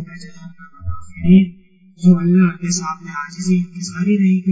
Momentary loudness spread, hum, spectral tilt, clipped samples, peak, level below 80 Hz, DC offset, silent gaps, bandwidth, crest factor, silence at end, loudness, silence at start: 19 LU; none; -6.5 dB/octave; under 0.1%; -2 dBFS; -40 dBFS; under 0.1%; none; 8 kHz; 16 dB; 0 s; -16 LUFS; 0 s